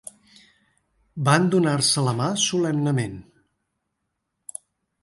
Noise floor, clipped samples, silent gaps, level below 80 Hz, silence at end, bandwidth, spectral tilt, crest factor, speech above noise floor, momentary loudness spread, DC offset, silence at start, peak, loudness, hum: -78 dBFS; under 0.1%; none; -62 dBFS; 1.8 s; 11.5 kHz; -4.5 dB/octave; 20 dB; 57 dB; 22 LU; under 0.1%; 1.15 s; -4 dBFS; -21 LUFS; none